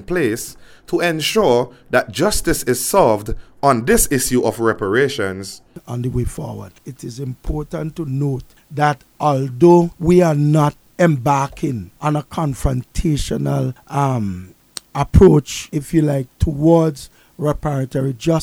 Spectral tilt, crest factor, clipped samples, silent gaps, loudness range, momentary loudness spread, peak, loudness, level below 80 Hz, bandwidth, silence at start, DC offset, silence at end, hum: -5.5 dB/octave; 18 dB; under 0.1%; none; 7 LU; 15 LU; 0 dBFS; -17 LUFS; -32 dBFS; 17 kHz; 0 s; under 0.1%; 0 s; none